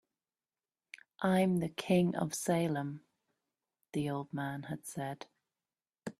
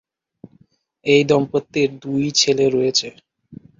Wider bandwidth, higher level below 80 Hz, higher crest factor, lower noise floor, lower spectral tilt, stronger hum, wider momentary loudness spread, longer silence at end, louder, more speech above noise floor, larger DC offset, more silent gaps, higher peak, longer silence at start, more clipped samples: first, 14 kHz vs 7.6 kHz; second, -72 dBFS vs -58 dBFS; about the same, 20 dB vs 18 dB; first, under -90 dBFS vs -57 dBFS; first, -6 dB/octave vs -4 dB/octave; neither; first, 21 LU vs 8 LU; second, 0.1 s vs 0.25 s; second, -35 LUFS vs -18 LUFS; first, over 57 dB vs 40 dB; neither; neither; second, -16 dBFS vs -2 dBFS; first, 1.2 s vs 1.05 s; neither